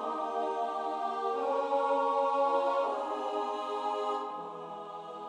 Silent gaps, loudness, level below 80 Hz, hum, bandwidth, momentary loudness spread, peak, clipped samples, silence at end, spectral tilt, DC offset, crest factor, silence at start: none; -32 LUFS; -82 dBFS; none; 10 kHz; 13 LU; -18 dBFS; under 0.1%; 0 s; -4 dB/octave; under 0.1%; 14 dB; 0 s